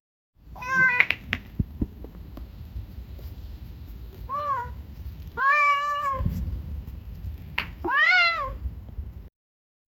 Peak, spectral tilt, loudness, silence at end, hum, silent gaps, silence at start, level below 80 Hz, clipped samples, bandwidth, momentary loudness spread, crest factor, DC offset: 0 dBFS; -5 dB/octave; -24 LUFS; 0.7 s; none; none; 0.45 s; -40 dBFS; under 0.1%; 17.5 kHz; 23 LU; 28 dB; under 0.1%